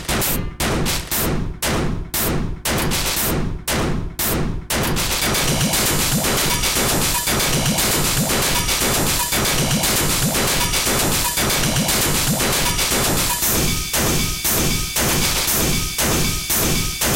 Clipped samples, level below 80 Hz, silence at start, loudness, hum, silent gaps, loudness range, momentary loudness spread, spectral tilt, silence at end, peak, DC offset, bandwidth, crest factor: under 0.1%; -30 dBFS; 0 s; -18 LUFS; none; none; 4 LU; 5 LU; -2.5 dB/octave; 0 s; -6 dBFS; 0.6%; 17 kHz; 14 dB